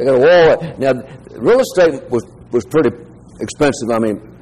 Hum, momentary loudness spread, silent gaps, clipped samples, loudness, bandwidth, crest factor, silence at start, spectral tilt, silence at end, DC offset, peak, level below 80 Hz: none; 12 LU; none; under 0.1%; -14 LUFS; 13.5 kHz; 12 dB; 0 s; -5.5 dB/octave; 0.15 s; 0.3%; -4 dBFS; -44 dBFS